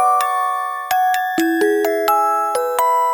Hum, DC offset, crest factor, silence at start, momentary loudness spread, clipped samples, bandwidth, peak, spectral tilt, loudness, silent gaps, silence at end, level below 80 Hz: none; under 0.1%; 14 dB; 0 s; 4 LU; under 0.1%; over 20 kHz; -4 dBFS; -2 dB/octave; -17 LUFS; none; 0 s; -64 dBFS